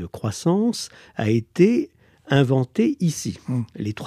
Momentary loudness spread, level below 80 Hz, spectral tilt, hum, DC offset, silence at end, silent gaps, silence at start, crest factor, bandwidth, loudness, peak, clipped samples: 11 LU; -58 dBFS; -6.5 dB/octave; none; under 0.1%; 0 s; none; 0 s; 18 dB; 14.5 kHz; -22 LUFS; -4 dBFS; under 0.1%